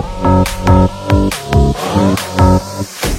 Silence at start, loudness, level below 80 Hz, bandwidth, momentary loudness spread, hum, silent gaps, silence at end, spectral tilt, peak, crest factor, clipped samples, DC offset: 0 s; -13 LUFS; -20 dBFS; 16.5 kHz; 3 LU; none; none; 0 s; -6 dB/octave; 0 dBFS; 12 dB; under 0.1%; under 0.1%